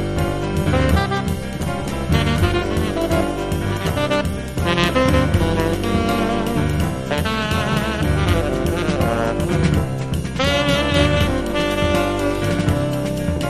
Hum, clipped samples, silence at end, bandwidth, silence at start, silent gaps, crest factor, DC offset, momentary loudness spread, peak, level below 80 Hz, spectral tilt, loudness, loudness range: none; under 0.1%; 0 s; 13.5 kHz; 0 s; none; 16 dB; under 0.1%; 6 LU; -2 dBFS; -28 dBFS; -6 dB/octave; -19 LUFS; 1 LU